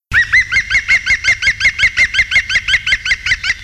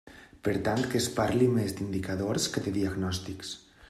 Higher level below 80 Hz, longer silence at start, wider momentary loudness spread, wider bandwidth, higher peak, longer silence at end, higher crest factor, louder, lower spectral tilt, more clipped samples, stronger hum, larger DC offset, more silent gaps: first, -34 dBFS vs -56 dBFS; about the same, 0.1 s vs 0.05 s; second, 3 LU vs 10 LU; about the same, 14 kHz vs 14.5 kHz; first, -2 dBFS vs -12 dBFS; second, 0 s vs 0.3 s; second, 12 dB vs 18 dB; first, -11 LUFS vs -30 LUFS; second, 0 dB/octave vs -5 dB/octave; neither; neither; neither; neither